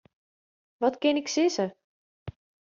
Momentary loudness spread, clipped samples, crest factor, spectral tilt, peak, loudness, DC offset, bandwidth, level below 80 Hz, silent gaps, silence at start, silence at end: 20 LU; under 0.1%; 18 dB; -3.5 dB/octave; -12 dBFS; -27 LUFS; under 0.1%; 7.4 kHz; -64 dBFS; 1.84-2.26 s; 0.8 s; 0.35 s